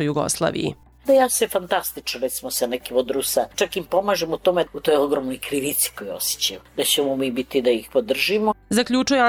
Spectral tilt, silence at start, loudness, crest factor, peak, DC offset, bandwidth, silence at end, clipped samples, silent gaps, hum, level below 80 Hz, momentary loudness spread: -3 dB/octave; 0 s; -22 LUFS; 16 dB; -6 dBFS; under 0.1%; over 20 kHz; 0 s; under 0.1%; none; none; -54 dBFS; 6 LU